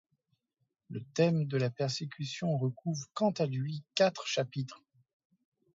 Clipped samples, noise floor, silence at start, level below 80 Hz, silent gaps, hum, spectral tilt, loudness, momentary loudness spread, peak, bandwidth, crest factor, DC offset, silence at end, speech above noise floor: under 0.1%; -82 dBFS; 0.9 s; -76 dBFS; none; none; -5.5 dB/octave; -33 LUFS; 10 LU; -14 dBFS; 7.8 kHz; 20 dB; under 0.1%; 1 s; 50 dB